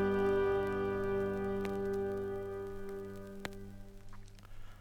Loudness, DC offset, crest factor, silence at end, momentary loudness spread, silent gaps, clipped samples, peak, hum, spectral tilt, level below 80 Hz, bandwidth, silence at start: -37 LUFS; under 0.1%; 16 dB; 0 s; 24 LU; none; under 0.1%; -20 dBFS; none; -7 dB/octave; -52 dBFS; 15 kHz; 0 s